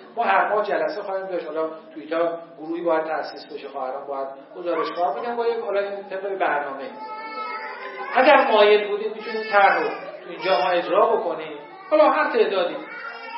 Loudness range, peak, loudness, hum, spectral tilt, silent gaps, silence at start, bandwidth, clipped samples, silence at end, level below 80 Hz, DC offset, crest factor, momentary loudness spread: 8 LU; -2 dBFS; -22 LUFS; none; -8 dB/octave; none; 0 s; 5.8 kHz; under 0.1%; 0 s; under -90 dBFS; under 0.1%; 20 dB; 17 LU